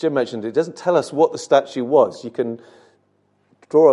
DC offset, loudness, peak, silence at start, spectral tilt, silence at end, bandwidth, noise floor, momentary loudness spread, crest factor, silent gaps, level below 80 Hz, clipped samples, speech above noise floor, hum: under 0.1%; -19 LUFS; -2 dBFS; 0 s; -5.5 dB/octave; 0 s; 11.5 kHz; -63 dBFS; 10 LU; 18 dB; none; -72 dBFS; under 0.1%; 44 dB; 50 Hz at -60 dBFS